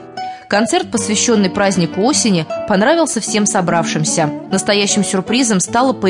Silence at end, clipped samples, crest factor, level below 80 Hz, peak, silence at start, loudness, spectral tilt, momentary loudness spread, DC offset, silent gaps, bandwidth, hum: 0 s; under 0.1%; 12 dB; -54 dBFS; -2 dBFS; 0 s; -14 LUFS; -3.5 dB/octave; 4 LU; under 0.1%; none; 11 kHz; none